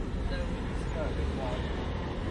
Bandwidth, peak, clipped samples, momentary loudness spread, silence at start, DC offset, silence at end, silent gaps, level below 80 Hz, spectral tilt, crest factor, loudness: 10.5 kHz; -20 dBFS; under 0.1%; 2 LU; 0 s; under 0.1%; 0 s; none; -36 dBFS; -7 dB/octave; 12 dB; -34 LUFS